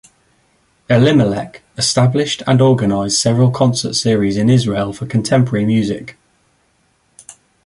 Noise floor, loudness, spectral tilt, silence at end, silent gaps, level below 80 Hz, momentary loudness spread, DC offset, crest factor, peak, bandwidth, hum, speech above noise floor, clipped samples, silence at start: -59 dBFS; -14 LUFS; -5.5 dB/octave; 1.55 s; none; -46 dBFS; 8 LU; under 0.1%; 14 dB; -2 dBFS; 11.5 kHz; none; 46 dB; under 0.1%; 0.9 s